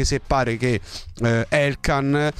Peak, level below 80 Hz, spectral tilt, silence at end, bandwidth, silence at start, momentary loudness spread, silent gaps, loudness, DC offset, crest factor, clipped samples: -4 dBFS; -34 dBFS; -5.5 dB/octave; 0.05 s; 13.5 kHz; 0 s; 6 LU; none; -21 LUFS; under 0.1%; 16 dB; under 0.1%